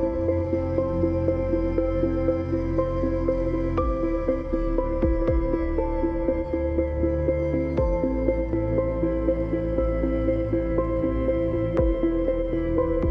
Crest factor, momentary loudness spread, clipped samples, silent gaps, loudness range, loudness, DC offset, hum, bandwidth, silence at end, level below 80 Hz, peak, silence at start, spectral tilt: 14 dB; 2 LU; under 0.1%; none; 1 LU; -25 LUFS; under 0.1%; none; 5.6 kHz; 0 s; -30 dBFS; -8 dBFS; 0 s; -10.5 dB/octave